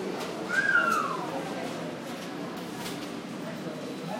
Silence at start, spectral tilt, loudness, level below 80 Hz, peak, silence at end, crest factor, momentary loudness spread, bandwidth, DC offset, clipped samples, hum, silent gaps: 0 s; -4 dB/octave; -31 LUFS; -70 dBFS; -12 dBFS; 0 s; 20 dB; 13 LU; 16 kHz; under 0.1%; under 0.1%; none; none